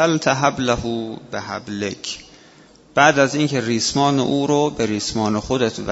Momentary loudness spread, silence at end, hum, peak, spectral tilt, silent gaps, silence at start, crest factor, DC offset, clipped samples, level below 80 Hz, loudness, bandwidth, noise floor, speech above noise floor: 13 LU; 0 s; none; 0 dBFS; -4.5 dB/octave; none; 0 s; 20 dB; under 0.1%; under 0.1%; -46 dBFS; -19 LUFS; 8 kHz; -48 dBFS; 29 dB